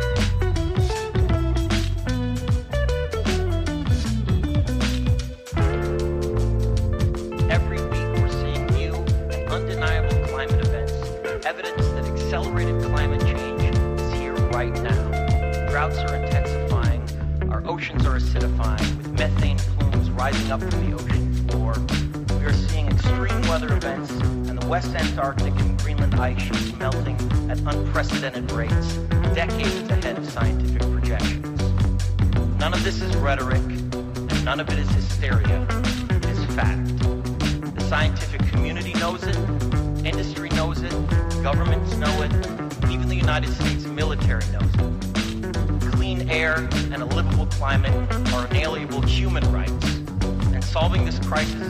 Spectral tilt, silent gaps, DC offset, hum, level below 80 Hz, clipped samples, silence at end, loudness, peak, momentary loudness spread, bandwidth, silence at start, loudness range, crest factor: -6 dB/octave; none; under 0.1%; none; -26 dBFS; under 0.1%; 0 s; -23 LUFS; -10 dBFS; 4 LU; 14.5 kHz; 0 s; 1 LU; 12 dB